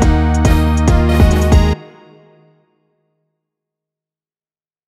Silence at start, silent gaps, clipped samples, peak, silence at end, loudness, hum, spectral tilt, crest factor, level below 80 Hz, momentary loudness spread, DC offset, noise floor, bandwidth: 0 s; none; under 0.1%; 0 dBFS; 3.05 s; -13 LUFS; none; -6.5 dB/octave; 14 dB; -18 dBFS; 3 LU; under 0.1%; under -90 dBFS; 14.5 kHz